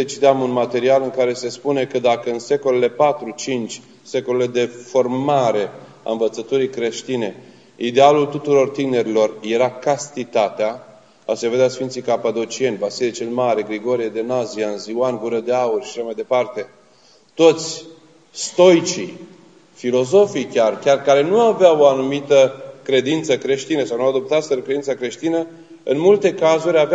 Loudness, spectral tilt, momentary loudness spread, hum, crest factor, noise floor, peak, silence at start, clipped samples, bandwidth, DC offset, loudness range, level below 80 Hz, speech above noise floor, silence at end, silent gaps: -18 LUFS; -4.5 dB/octave; 12 LU; none; 18 dB; -52 dBFS; 0 dBFS; 0 s; under 0.1%; 9 kHz; 0.1%; 5 LU; -72 dBFS; 35 dB; 0 s; none